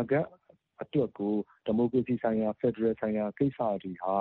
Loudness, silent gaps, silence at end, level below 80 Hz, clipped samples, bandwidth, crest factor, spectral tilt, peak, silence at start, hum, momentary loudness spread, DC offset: -30 LUFS; none; 0 s; -66 dBFS; under 0.1%; 4.2 kHz; 16 dB; -7.5 dB/octave; -14 dBFS; 0 s; none; 5 LU; under 0.1%